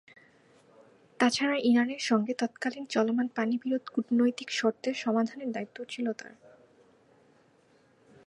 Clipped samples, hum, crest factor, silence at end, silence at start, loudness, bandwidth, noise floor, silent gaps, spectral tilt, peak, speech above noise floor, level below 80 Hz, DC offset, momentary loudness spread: under 0.1%; none; 22 dB; 2.15 s; 1.2 s; -29 LUFS; 11 kHz; -64 dBFS; none; -4 dB/octave; -8 dBFS; 35 dB; -80 dBFS; under 0.1%; 10 LU